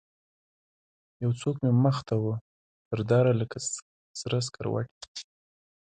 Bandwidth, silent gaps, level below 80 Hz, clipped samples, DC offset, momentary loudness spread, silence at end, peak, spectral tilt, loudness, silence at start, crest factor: 9.6 kHz; 2.41-2.91 s, 3.82-4.14 s, 4.91-5.01 s, 5.08-5.15 s; -62 dBFS; under 0.1%; under 0.1%; 15 LU; 0.65 s; -10 dBFS; -6 dB/octave; -28 LUFS; 1.2 s; 18 dB